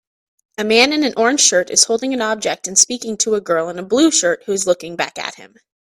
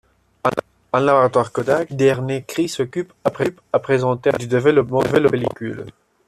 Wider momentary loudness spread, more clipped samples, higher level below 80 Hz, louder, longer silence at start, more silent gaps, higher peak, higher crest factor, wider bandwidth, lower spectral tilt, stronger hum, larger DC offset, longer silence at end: about the same, 11 LU vs 9 LU; neither; second, -62 dBFS vs -54 dBFS; first, -15 LUFS vs -19 LUFS; first, 0.6 s vs 0.45 s; neither; about the same, 0 dBFS vs -2 dBFS; about the same, 18 dB vs 16 dB; first, 16 kHz vs 13.5 kHz; second, -1.5 dB/octave vs -6.5 dB/octave; neither; neither; about the same, 0.4 s vs 0.35 s